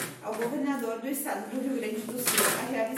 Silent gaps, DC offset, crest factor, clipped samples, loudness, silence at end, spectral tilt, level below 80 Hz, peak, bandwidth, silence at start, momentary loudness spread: none; under 0.1%; 22 dB; under 0.1%; -29 LUFS; 0 s; -2.5 dB/octave; -76 dBFS; -10 dBFS; 16.5 kHz; 0 s; 9 LU